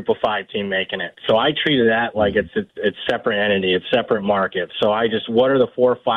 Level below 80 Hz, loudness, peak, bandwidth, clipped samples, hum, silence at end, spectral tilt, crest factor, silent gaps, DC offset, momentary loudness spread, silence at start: -52 dBFS; -19 LUFS; -4 dBFS; 5.6 kHz; under 0.1%; none; 0 s; -7 dB/octave; 14 dB; none; under 0.1%; 6 LU; 0 s